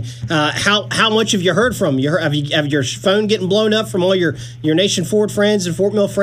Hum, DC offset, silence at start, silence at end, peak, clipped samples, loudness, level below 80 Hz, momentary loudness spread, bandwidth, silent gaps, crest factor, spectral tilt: none; under 0.1%; 0 s; 0 s; 0 dBFS; under 0.1%; -16 LUFS; -48 dBFS; 3 LU; 15.5 kHz; none; 16 dB; -4.5 dB/octave